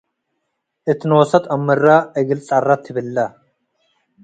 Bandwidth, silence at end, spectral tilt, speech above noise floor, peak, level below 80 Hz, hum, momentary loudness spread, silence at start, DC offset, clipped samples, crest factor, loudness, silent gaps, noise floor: 9.2 kHz; 0.95 s; -7 dB/octave; 58 dB; 0 dBFS; -62 dBFS; none; 10 LU; 0.85 s; under 0.1%; under 0.1%; 18 dB; -17 LUFS; none; -74 dBFS